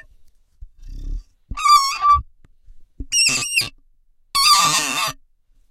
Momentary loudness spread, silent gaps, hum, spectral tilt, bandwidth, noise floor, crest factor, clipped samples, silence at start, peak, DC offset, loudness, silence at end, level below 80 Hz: 22 LU; none; none; 0.5 dB/octave; 16.5 kHz; -55 dBFS; 18 dB; under 0.1%; 0.6 s; -4 dBFS; under 0.1%; -16 LUFS; 0.6 s; -36 dBFS